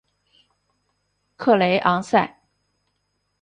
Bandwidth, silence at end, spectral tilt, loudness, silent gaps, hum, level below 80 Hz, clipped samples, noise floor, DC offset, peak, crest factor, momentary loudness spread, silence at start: 10 kHz; 1.15 s; -6 dB/octave; -20 LUFS; none; 50 Hz at -50 dBFS; -64 dBFS; under 0.1%; -73 dBFS; under 0.1%; -4 dBFS; 20 dB; 8 LU; 1.4 s